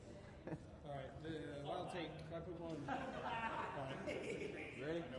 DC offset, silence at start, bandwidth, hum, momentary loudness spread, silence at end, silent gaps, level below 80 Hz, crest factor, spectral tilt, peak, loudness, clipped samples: under 0.1%; 0 s; 11 kHz; none; 8 LU; 0 s; none; -68 dBFS; 16 dB; -6 dB/octave; -32 dBFS; -48 LUFS; under 0.1%